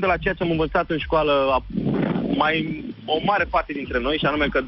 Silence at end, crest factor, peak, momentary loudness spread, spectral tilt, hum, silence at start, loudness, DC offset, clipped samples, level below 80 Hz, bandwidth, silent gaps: 0 s; 16 dB; -6 dBFS; 5 LU; -9 dB/octave; none; 0 s; -22 LUFS; under 0.1%; under 0.1%; -38 dBFS; 6 kHz; none